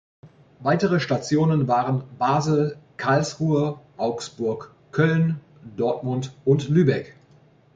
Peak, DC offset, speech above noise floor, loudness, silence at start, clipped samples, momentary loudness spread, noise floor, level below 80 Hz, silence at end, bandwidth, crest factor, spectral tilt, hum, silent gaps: -6 dBFS; under 0.1%; 33 dB; -23 LUFS; 0.25 s; under 0.1%; 9 LU; -55 dBFS; -58 dBFS; 0.65 s; 7.8 kHz; 18 dB; -7 dB/octave; none; none